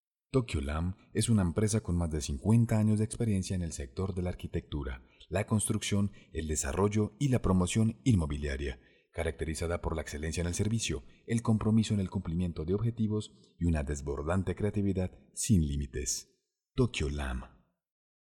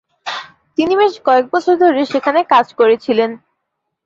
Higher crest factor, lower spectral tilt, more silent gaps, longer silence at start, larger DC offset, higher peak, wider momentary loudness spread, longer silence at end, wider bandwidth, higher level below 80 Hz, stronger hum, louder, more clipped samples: about the same, 18 dB vs 14 dB; about the same, -6 dB/octave vs -5 dB/octave; neither; about the same, 0.35 s vs 0.25 s; neither; second, -14 dBFS vs 0 dBFS; second, 9 LU vs 13 LU; first, 0.9 s vs 0.7 s; first, 17 kHz vs 7.6 kHz; first, -44 dBFS vs -60 dBFS; neither; second, -32 LUFS vs -14 LUFS; neither